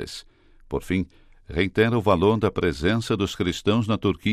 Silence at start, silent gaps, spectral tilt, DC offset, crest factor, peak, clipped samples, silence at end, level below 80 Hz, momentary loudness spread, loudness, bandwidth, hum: 0 s; none; -6.5 dB/octave; under 0.1%; 18 dB; -6 dBFS; under 0.1%; 0 s; -44 dBFS; 13 LU; -23 LUFS; 14.5 kHz; none